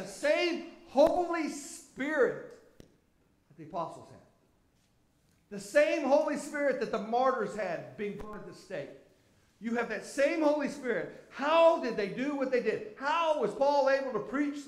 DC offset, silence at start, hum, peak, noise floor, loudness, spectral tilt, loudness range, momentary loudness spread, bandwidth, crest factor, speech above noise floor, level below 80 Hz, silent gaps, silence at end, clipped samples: under 0.1%; 0 s; none; -12 dBFS; -70 dBFS; -30 LUFS; -4.5 dB/octave; 8 LU; 16 LU; 14 kHz; 20 dB; 39 dB; -64 dBFS; none; 0 s; under 0.1%